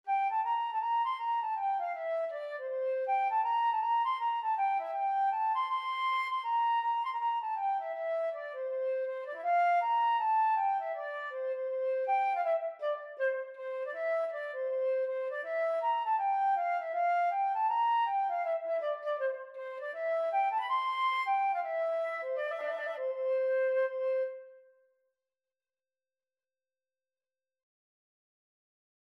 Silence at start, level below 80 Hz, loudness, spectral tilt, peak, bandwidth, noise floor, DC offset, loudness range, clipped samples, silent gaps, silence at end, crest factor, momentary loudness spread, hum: 0.05 s; under -90 dBFS; -32 LUFS; 0.5 dB/octave; -22 dBFS; 11 kHz; under -90 dBFS; under 0.1%; 3 LU; under 0.1%; none; 4.55 s; 12 dB; 8 LU; none